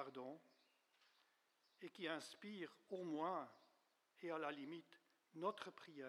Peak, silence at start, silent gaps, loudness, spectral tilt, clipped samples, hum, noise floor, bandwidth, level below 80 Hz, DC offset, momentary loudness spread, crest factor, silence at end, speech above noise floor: -32 dBFS; 0 s; none; -51 LUFS; -5 dB/octave; under 0.1%; none; -82 dBFS; 13 kHz; under -90 dBFS; under 0.1%; 14 LU; 20 dB; 0 s; 32 dB